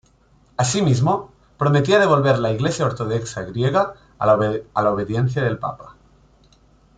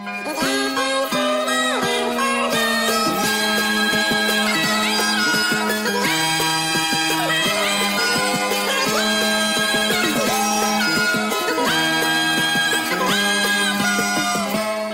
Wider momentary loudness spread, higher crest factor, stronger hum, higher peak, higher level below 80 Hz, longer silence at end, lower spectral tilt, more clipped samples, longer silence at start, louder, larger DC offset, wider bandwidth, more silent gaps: first, 10 LU vs 3 LU; first, 18 dB vs 12 dB; neither; first, -2 dBFS vs -8 dBFS; about the same, -50 dBFS vs -54 dBFS; first, 1.05 s vs 0 s; first, -6 dB/octave vs -2 dB/octave; neither; first, 0.6 s vs 0 s; about the same, -20 LUFS vs -18 LUFS; neither; second, 9.4 kHz vs 16.5 kHz; neither